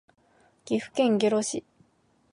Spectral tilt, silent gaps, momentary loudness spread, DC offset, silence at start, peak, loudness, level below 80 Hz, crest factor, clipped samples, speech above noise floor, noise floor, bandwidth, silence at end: -4.5 dB/octave; none; 9 LU; under 0.1%; 0.65 s; -12 dBFS; -26 LUFS; -72 dBFS; 16 dB; under 0.1%; 41 dB; -66 dBFS; 11.5 kHz; 0.7 s